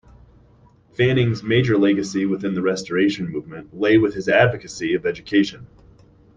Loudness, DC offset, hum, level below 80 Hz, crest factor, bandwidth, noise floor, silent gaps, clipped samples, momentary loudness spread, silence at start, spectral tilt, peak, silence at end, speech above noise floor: -20 LUFS; under 0.1%; none; -52 dBFS; 18 dB; 9.2 kHz; -53 dBFS; none; under 0.1%; 11 LU; 1 s; -6.5 dB/octave; -2 dBFS; 0.7 s; 33 dB